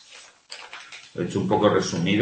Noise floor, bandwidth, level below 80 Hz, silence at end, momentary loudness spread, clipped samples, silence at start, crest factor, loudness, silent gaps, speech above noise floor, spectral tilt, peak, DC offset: -49 dBFS; 8.8 kHz; -58 dBFS; 0 s; 20 LU; under 0.1%; 0.1 s; 20 dB; -23 LUFS; none; 27 dB; -5.5 dB/octave; -6 dBFS; under 0.1%